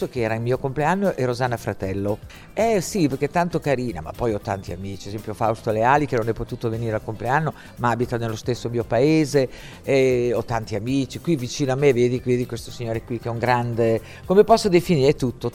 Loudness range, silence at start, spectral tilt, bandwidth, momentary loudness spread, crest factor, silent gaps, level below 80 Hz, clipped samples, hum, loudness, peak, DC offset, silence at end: 3 LU; 0 s; -6 dB/octave; 16.5 kHz; 11 LU; 20 dB; none; -46 dBFS; under 0.1%; none; -22 LUFS; -2 dBFS; under 0.1%; 0 s